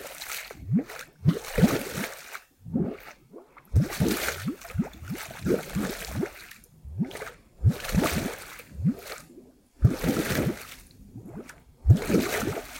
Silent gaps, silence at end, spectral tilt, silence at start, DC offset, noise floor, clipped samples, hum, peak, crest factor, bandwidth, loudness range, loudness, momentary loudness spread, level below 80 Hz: none; 0 s; -6 dB/octave; 0 s; under 0.1%; -52 dBFS; under 0.1%; none; -6 dBFS; 22 dB; 17 kHz; 3 LU; -28 LUFS; 19 LU; -42 dBFS